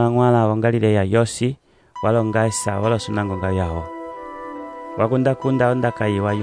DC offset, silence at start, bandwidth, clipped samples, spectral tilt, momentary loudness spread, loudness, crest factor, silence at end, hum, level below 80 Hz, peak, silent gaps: under 0.1%; 0 s; 11 kHz; under 0.1%; -6.5 dB/octave; 16 LU; -19 LUFS; 16 dB; 0 s; none; -46 dBFS; -4 dBFS; none